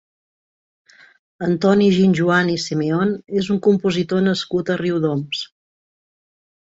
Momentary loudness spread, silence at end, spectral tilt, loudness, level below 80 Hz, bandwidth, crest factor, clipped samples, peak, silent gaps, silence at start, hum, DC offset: 9 LU; 1.2 s; -6.5 dB/octave; -18 LUFS; -58 dBFS; 8 kHz; 18 dB; under 0.1%; -2 dBFS; none; 1.4 s; none; under 0.1%